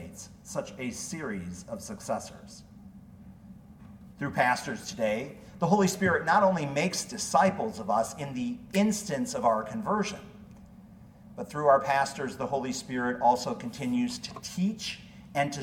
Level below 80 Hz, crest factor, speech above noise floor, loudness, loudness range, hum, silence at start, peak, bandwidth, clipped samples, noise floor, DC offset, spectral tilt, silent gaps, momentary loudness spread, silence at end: -60 dBFS; 20 dB; 22 dB; -29 LUFS; 11 LU; none; 0 s; -10 dBFS; 17 kHz; under 0.1%; -51 dBFS; under 0.1%; -4.5 dB/octave; none; 17 LU; 0 s